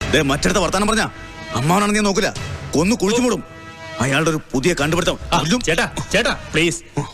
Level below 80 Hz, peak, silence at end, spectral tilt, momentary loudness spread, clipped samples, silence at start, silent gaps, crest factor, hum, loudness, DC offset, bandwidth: -34 dBFS; -4 dBFS; 0 s; -4 dB/octave; 9 LU; under 0.1%; 0 s; none; 14 dB; none; -18 LUFS; under 0.1%; 14 kHz